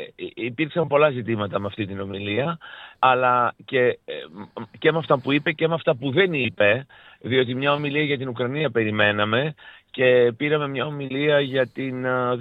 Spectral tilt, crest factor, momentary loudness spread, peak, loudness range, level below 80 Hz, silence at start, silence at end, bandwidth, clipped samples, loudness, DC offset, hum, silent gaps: -8.5 dB/octave; 18 dB; 11 LU; -4 dBFS; 2 LU; -68 dBFS; 0 s; 0 s; 4.9 kHz; under 0.1%; -22 LUFS; under 0.1%; none; none